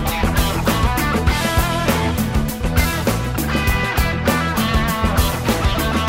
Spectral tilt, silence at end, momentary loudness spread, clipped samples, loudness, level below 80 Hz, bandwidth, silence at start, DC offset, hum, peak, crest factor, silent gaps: -5 dB/octave; 0 s; 2 LU; under 0.1%; -18 LUFS; -24 dBFS; 16.5 kHz; 0 s; under 0.1%; none; -2 dBFS; 16 dB; none